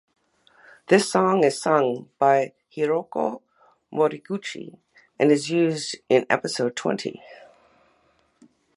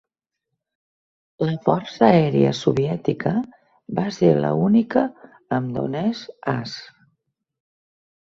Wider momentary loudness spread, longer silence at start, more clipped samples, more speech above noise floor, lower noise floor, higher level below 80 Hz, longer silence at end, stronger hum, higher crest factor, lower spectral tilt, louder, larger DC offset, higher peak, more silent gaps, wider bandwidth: first, 14 LU vs 11 LU; second, 0.9 s vs 1.4 s; neither; second, 42 dB vs 62 dB; second, -64 dBFS vs -82 dBFS; second, -74 dBFS vs -58 dBFS; about the same, 1.4 s vs 1.4 s; neither; about the same, 22 dB vs 20 dB; second, -5 dB/octave vs -7.5 dB/octave; about the same, -23 LUFS vs -21 LUFS; neither; about the same, -2 dBFS vs -2 dBFS; neither; first, 11.5 kHz vs 7.6 kHz